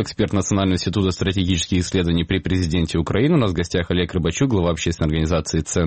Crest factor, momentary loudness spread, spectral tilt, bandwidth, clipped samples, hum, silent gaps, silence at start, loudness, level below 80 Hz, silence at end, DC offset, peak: 14 dB; 3 LU; -5.5 dB/octave; 8.8 kHz; under 0.1%; none; none; 0 s; -20 LUFS; -34 dBFS; 0 s; 0.4%; -4 dBFS